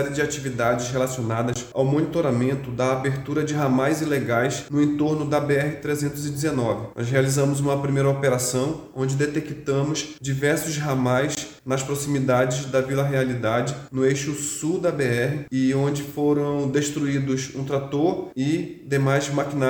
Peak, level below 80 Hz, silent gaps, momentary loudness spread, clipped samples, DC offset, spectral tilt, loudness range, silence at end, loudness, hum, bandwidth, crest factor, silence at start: -6 dBFS; -54 dBFS; none; 5 LU; under 0.1%; under 0.1%; -5.5 dB/octave; 1 LU; 0 s; -23 LUFS; none; over 20 kHz; 18 dB; 0 s